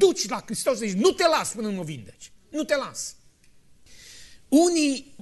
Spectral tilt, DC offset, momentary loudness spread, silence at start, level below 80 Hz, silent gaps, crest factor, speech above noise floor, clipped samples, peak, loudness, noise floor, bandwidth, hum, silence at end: -3.5 dB/octave; under 0.1%; 16 LU; 0 s; -60 dBFS; none; 18 dB; 30 dB; under 0.1%; -6 dBFS; -24 LUFS; -54 dBFS; 12.5 kHz; none; 0.05 s